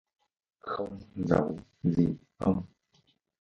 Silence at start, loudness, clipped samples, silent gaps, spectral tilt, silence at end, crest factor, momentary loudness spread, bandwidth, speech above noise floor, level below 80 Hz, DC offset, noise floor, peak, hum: 0.65 s; -31 LUFS; under 0.1%; none; -9.5 dB/octave; 0.75 s; 24 dB; 11 LU; 7.2 kHz; 40 dB; -54 dBFS; under 0.1%; -70 dBFS; -8 dBFS; none